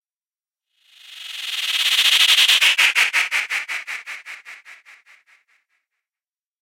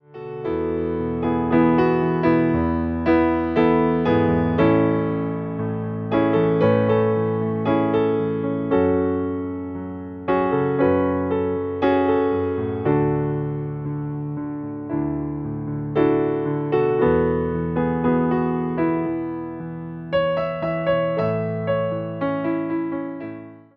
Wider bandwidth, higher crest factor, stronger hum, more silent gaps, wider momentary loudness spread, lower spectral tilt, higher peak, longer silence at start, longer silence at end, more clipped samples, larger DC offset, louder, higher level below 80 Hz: first, 16.5 kHz vs 5.4 kHz; about the same, 20 dB vs 16 dB; neither; neither; first, 22 LU vs 10 LU; second, 5 dB/octave vs -10.5 dB/octave; about the same, -2 dBFS vs -4 dBFS; first, 1.1 s vs 0.1 s; first, 1.9 s vs 0.2 s; neither; neither; first, -15 LUFS vs -21 LUFS; second, -78 dBFS vs -44 dBFS